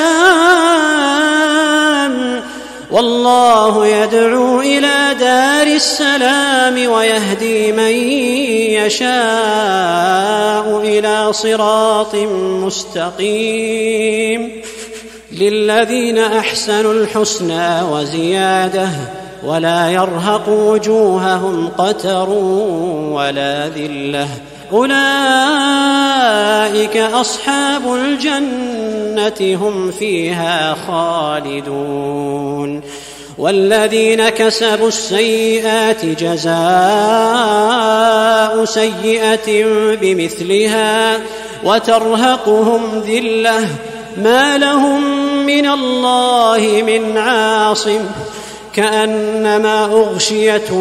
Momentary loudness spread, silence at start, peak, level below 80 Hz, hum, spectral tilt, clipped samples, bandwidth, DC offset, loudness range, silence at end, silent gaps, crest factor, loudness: 9 LU; 0 s; 0 dBFS; -52 dBFS; none; -3.5 dB/octave; under 0.1%; 15 kHz; under 0.1%; 5 LU; 0 s; none; 12 dB; -13 LUFS